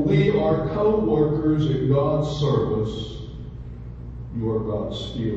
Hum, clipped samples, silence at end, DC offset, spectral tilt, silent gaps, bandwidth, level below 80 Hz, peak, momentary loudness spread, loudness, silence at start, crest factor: 60 Hz at -35 dBFS; under 0.1%; 0 s; under 0.1%; -8.5 dB/octave; none; 7.6 kHz; -38 dBFS; -6 dBFS; 17 LU; -22 LUFS; 0 s; 16 dB